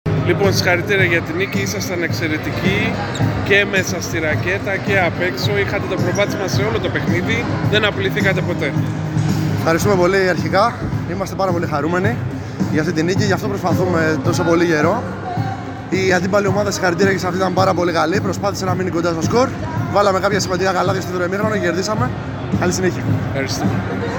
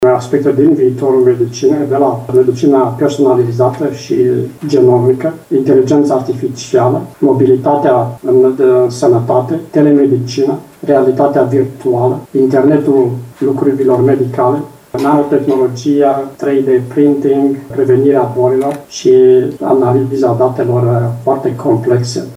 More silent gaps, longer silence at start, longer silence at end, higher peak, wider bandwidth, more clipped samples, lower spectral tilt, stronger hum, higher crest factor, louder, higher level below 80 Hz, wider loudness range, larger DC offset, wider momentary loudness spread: neither; about the same, 0.05 s vs 0 s; about the same, 0 s vs 0 s; about the same, -2 dBFS vs 0 dBFS; first, 19 kHz vs 14 kHz; neither; second, -5.5 dB/octave vs -7.5 dB/octave; neither; first, 16 dB vs 10 dB; second, -17 LUFS vs -11 LUFS; first, -42 dBFS vs -56 dBFS; about the same, 1 LU vs 2 LU; neither; about the same, 6 LU vs 6 LU